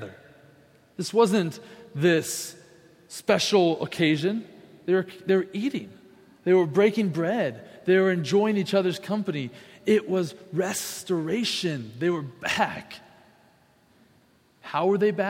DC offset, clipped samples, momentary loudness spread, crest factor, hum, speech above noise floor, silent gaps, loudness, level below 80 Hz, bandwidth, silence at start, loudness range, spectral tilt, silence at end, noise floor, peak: under 0.1%; under 0.1%; 15 LU; 20 dB; none; 37 dB; none; -25 LUFS; -70 dBFS; 16.5 kHz; 0 s; 5 LU; -5 dB/octave; 0 s; -61 dBFS; -6 dBFS